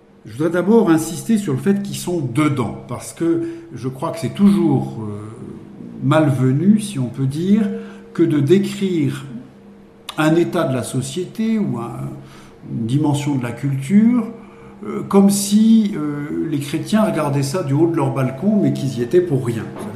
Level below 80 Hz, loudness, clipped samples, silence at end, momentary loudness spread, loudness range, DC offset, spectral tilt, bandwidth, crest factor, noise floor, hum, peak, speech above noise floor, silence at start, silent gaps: -54 dBFS; -18 LUFS; under 0.1%; 0 s; 16 LU; 4 LU; under 0.1%; -6.5 dB/octave; 15 kHz; 16 dB; -43 dBFS; none; -2 dBFS; 26 dB; 0.25 s; none